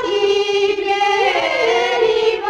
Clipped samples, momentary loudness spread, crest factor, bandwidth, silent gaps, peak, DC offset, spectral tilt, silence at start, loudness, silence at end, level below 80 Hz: under 0.1%; 2 LU; 12 dB; 9.8 kHz; none; -4 dBFS; under 0.1%; -2 dB/octave; 0 s; -16 LUFS; 0 s; -54 dBFS